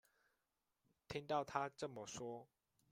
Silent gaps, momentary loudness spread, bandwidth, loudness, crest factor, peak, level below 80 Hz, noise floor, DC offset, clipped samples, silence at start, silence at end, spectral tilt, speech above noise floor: none; 9 LU; 15.5 kHz; -46 LUFS; 24 dB; -24 dBFS; -78 dBFS; -89 dBFS; under 0.1%; under 0.1%; 1.1 s; 0.45 s; -4.5 dB/octave; 43 dB